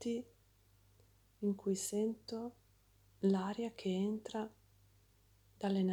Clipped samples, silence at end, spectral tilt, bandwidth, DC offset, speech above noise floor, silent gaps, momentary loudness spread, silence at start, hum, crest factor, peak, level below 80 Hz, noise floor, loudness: under 0.1%; 0 s; -6 dB/octave; 15 kHz; under 0.1%; 32 dB; none; 10 LU; 0 s; none; 18 dB; -22 dBFS; -74 dBFS; -69 dBFS; -39 LUFS